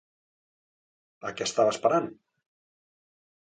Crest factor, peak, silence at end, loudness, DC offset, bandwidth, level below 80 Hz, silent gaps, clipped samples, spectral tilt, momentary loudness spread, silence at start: 22 dB; -10 dBFS; 1.3 s; -26 LUFS; under 0.1%; 9.4 kHz; -74 dBFS; none; under 0.1%; -3.5 dB/octave; 15 LU; 1.25 s